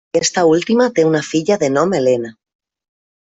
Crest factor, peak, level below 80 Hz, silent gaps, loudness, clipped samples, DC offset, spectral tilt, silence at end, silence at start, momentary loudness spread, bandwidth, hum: 14 dB; -2 dBFS; -58 dBFS; none; -15 LUFS; under 0.1%; under 0.1%; -4.5 dB/octave; 0.95 s; 0.15 s; 4 LU; 8 kHz; none